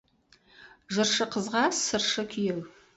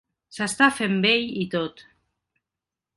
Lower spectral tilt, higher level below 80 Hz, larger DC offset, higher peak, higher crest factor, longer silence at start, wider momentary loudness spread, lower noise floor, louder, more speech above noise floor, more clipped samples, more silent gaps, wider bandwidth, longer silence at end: second, -2.5 dB/octave vs -4 dB/octave; about the same, -66 dBFS vs -64 dBFS; neither; second, -12 dBFS vs -4 dBFS; about the same, 18 dB vs 20 dB; first, 0.6 s vs 0.35 s; second, 7 LU vs 12 LU; second, -63 dBFS vs -88 dBFS; second, -27 LUFS vs -22 LUFS; second, 35 dB vs 65 dB; neither; neither; second, 8.2 kHz vs 11.5 kHz; second, 0.25 s vs 1.15 s